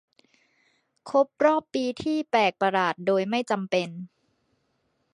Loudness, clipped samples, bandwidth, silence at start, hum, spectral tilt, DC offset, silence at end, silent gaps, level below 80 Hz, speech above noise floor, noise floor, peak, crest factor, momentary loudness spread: -25 LUFS; under 0.1%; 11 kHz; 1.05 s; none; -5.5 dB/octave; under 0.1%; 1.05 s; none; -70 dBFS; 48 dB; -73 dBFS; -6 dBFS; 20 dB; 7 LU